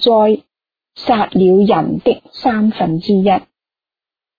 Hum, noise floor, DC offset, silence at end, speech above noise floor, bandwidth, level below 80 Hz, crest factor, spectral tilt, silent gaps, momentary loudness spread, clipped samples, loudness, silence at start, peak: none; -90 dBFS; under 0.1%; 1 s; 77 dB; 5 kHz; -50 dBFS; 14 dB; -9 dB/octave; none; 7 LU; under 0.1%; -14 LUFS; 0 s; -2 dBFS